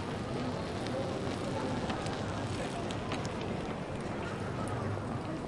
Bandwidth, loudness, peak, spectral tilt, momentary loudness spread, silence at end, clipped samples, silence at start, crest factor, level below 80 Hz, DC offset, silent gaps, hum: 11.5 kHz; -36 LUFS; -20 dBFS; -6 dB/octave; 3 LU; 0 s; under 0.1%; 0 s; 16 dB; -52 dBFS; under 0.1%; none; none